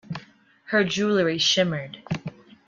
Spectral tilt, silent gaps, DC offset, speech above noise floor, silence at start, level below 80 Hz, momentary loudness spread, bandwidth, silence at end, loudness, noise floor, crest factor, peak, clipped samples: -4 dB/octave; none; under 0.1%; 30 dB; 0.1 s; -62 dBFS; 18 LU; 7.6 kHz; 0.35 s; -23 LUFS; -52 dBFS; 18 dB; -8 dBFS; under 0.1%